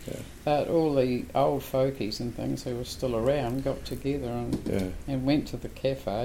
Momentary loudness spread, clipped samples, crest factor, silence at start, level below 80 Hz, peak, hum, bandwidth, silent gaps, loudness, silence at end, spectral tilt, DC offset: 8 LU; under 0.1%; 16 dB; 0 s; -44 dBFS; -12 dBFS; none; 16.5 kHz; none; -29 LUFS; 0 s; -6.5 dB/octave; under 0.1%